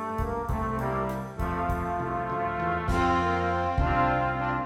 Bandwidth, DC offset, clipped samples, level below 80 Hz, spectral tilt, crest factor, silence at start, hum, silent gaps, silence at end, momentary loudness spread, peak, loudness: 16 kHz; under 0.1%; under 0.1%; -36 dBFS; -7 dB/octave; 14 dB; 0 s; none; none; 0 s; 6 LU; -12 dBFS; -28 LUFS